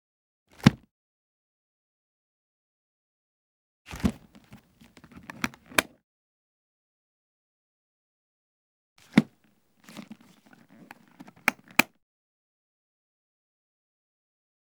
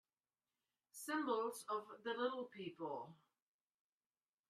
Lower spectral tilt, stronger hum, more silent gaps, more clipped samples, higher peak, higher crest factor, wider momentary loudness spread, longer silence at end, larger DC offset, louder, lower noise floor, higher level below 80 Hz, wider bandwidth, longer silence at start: about the same, -4.5 dB/octave vs -3.5 dB/octave; neither; first, 0.91-3.85 s, 6.04-8.96 s vs none; neither; first, 0 dBFS vs -26 dBFS; first, 34 dB vs 20 dB; first, 24 LU vs 11 LU; first, 2.9 s vs 1.35 s; neither; first, -27 LUFS vs -45 LUFS; second, -67 dBFS vs under -90 dBFS; first, -56 dBFS vs under -90 dBFS; first, over 20 kHz vs 13 kHz; second, 0.65 s vs 0.95 s